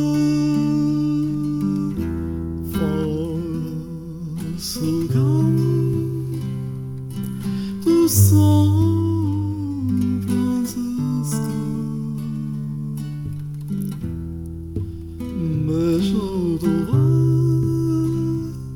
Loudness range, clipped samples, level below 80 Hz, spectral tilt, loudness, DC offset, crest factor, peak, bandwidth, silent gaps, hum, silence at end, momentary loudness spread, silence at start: 8 LU; under 0.1%; -40 dBFS; -7 dB/octave; -21 LUFS; under 0.1%; 18 dB; -2 dBFS; 18 kHz; none; none; 0 s; 12 LU; 0 s